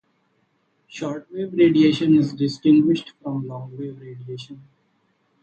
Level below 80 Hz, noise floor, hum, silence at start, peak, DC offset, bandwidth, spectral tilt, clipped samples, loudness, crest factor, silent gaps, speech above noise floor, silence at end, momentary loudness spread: -66 dBFS; -67 dBFS; none; 0.95 s; -6 dBFS; under 0.1%; 8 kHz; -7.5 dB/octave; under 0.1%; -20 LUFS; 16 dB; none; 46 dB; 0.85 s; 20 LU